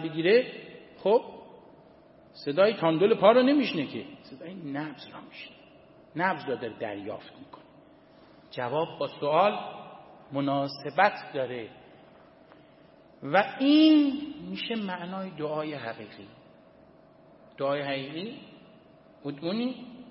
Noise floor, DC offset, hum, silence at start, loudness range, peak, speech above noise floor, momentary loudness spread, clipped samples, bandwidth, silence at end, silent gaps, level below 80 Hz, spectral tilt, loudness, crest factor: -56 dBFS; under 0.1%; none; 0 s; 10 LU; -6 dBFS; 29 dB; 23 LU; under 0.1%; 5.8 kHz; 0.05 s; none; -74 dBFS; -9.5 dB/octave; -27 LUFS; 24 dB